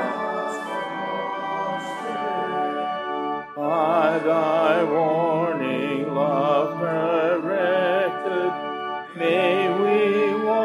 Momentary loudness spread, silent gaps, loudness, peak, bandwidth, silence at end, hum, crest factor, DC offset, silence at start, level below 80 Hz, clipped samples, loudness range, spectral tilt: 8 LU; none; -23 LUFS; -6 dBFS; 12.5 kHz; 0 s; none; 16 dB; under 0.1%; 0 s; -72 dBFS; under 0.1%; 5 LU; -6.5 dB/octave